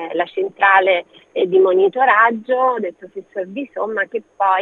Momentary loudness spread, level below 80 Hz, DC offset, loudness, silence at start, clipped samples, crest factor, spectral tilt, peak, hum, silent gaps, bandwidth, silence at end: 15 LU; -76 dBFS; under 0.1%; -16 LUFS; 0 s; under 0.1%; 16 dB; -6.5 dB/octave; 0 dBFS; none; none; 4.1 kHz; 0 s